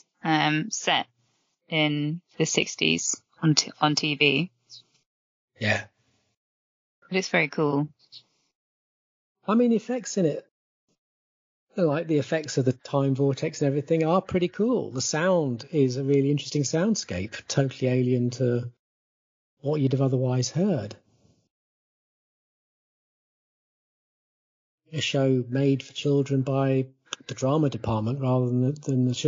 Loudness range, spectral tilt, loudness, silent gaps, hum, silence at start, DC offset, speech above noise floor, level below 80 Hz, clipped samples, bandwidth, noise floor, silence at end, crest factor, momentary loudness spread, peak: 5 LU; -5 dB/octave; -25 LUFS; 5.06-5.48 s, 6.37-7.02 s, 8.55-9.35 s, 10.51-10.88 s, 10.98-11.67 s, 18.79-19.57 s, 21.51-24.78 s; none; 0.25 s; under 0.1%; 47 dB; -64 dBFS; under 0.1%; 7.6 kHz; -71 dBFS; 0 s; 22 dB; 7 LU; -6 dBFS